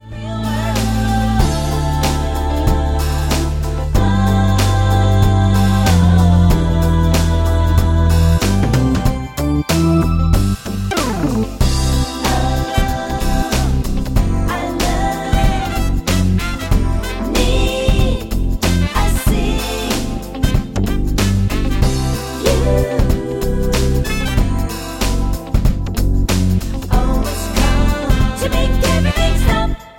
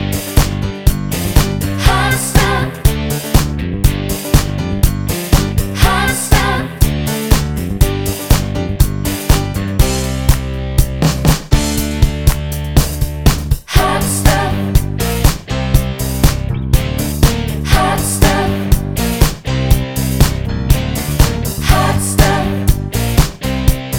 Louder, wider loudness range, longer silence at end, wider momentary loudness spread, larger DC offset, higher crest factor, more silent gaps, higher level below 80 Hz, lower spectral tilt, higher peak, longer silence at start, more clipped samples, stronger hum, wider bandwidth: about the same, -16 LUFS vs -15 LUFS; first, 5 LU vs 1 LU; about the same, 0.1 s vs 0 s; about the same, 6 LU vs 5 LU; neither; about the same, 14 dB vs 14 dB; neither; about the same, -18 dBFS vs -18 dBFS; about the same, -5.5 dB/octave vs -5 dB/octave; about the same, -2 dBFS vs 0 dBFS; about the same, 0.05 s vs 0 s; second, under 0.1% vs 0.2%; neither; second, 17 kHz vs over 20 kHz